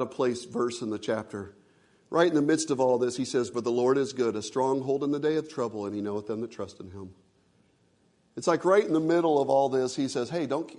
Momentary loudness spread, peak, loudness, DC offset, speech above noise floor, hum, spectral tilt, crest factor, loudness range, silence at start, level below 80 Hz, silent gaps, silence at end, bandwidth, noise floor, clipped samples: 16 LU; -8 dBFS; -27 LUFS; under 0.1%; 39 dB; none; -5 dB/octave; 20 dB; 6 LU; 0 s; -74 dBFS; none; 0 s; 11 kHz; -66 dBFS; under 0.1%